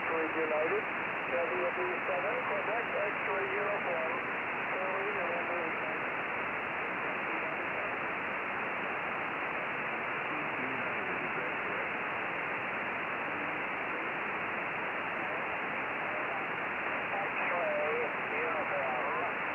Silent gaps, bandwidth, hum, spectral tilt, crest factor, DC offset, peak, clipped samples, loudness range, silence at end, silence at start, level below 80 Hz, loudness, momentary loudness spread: none; 16.5 kHz; none; -6.5 dB/octave; 14 dB; under 0.1%; -20 dBFS; under 0.1%; 2 LU; 0 s; 0 s; -72 dBFS; -33 LUFS; 3 LU